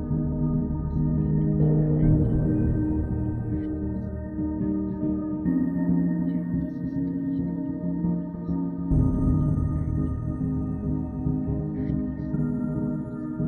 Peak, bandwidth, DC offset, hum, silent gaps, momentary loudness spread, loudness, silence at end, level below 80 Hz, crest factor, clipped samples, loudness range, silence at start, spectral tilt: -10 dBFS; 2.2 kHz; under 0.1%; none; none; 7 LU; -26 LUFS; 0 s; -34 dBFS; 14 dB; under 0.1%; 4 LU; 0 s; -12.5 dB/octave